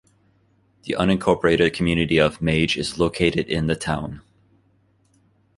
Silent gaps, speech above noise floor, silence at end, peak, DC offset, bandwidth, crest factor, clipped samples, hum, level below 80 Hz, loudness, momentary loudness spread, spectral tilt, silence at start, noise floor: none; 41 dB; 1.35 s; -2 dBFS; under 0.1%; 11.5 kHz; 20 dB; under 0.1%; none; -42 dBFS; -21 LUFS; 10 LU; -5.5 dB/octave; 0.85 s; -62 dBFS